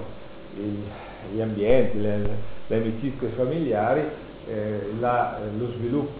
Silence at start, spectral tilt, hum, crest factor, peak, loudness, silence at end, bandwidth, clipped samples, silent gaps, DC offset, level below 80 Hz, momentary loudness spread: 0 s; -7 dB/octave; none; 18 dB; -8 dBFS; -26 LUFS; 0 s; 4.8 kHz; under 0.1%; none; under 0.1%; -44 dBFS; 15 LU